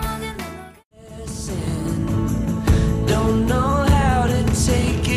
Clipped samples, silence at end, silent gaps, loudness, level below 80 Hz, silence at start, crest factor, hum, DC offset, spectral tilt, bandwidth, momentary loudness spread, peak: under 0.1%; 0 s; 0.84-0.91 s; -20 LUFS; -26 dBFS; 0 s; 14 dB; none; under 0.1%; -6 dB/octave; 15.5 kHz; 14 LU; -6 dBFS